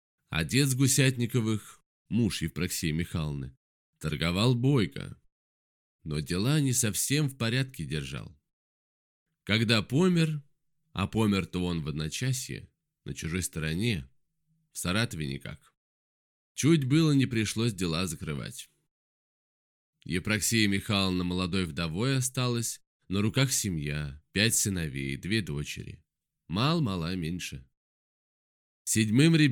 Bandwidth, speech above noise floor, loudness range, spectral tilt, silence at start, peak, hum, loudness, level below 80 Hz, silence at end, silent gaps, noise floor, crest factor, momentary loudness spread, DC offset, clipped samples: 19 kHz; 46 dB; 5 LU; -4.5 dB/octave; 0.3 s; -8 dBFS; none; -28 LUFS; -52 dBFS; 0 s; 1.86-2.05 s, 3.57-3.93 s, 5.32-5.99 s, 8.53-9.26 s, 15.77-16.55 s, 18.91-19.93 s, 22.87-23.00 s, 27.77-28.85 s; -74 dBFS; 22 dB; 15 LU; under 0.1%; under 0.1%